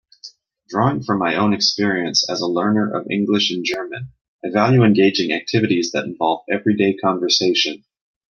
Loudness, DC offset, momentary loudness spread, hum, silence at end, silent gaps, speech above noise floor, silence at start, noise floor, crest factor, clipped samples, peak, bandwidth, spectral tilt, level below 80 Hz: -18 LUFS; under 0.1%; 9 LU; none; 0.55 s; 4.21-4.39 s; 25 dB; 0.25 s; -43 dBFS; 16 dB; under 0.1%; -2 dBFS; 7 kHz; -4.5 dB/octave; -62 dBFS